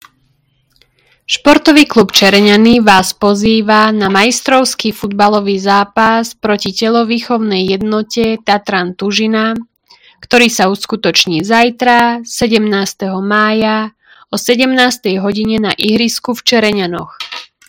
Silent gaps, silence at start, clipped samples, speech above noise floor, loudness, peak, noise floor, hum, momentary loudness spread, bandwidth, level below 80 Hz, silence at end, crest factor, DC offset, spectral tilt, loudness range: none; 1.3 s; 1%; 46 dB; -11 LUFS; 0 dBFS; -57 dBFS; none; 10 LU; over 20 kHz; -44 dBFS; 0.25 s; 12 dB; under 0.1%; -4 dB/octave; 5 LU